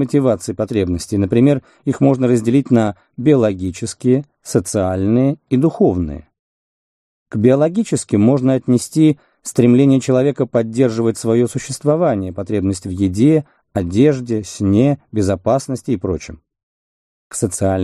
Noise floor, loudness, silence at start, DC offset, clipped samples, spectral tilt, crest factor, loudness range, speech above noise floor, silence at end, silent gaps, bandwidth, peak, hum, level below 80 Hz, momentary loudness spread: under -90 dBFS; -16 LUFS; 0 s; under 0.1%; under 0.1%; -7 dB/octave; 16 dB; 3 LU; over 75 dB; 0 s; 6.39-7.26 s, 16.63-17.30 s; 13 kHz; 0 dBFS; none; -46 dBFS; 9 LU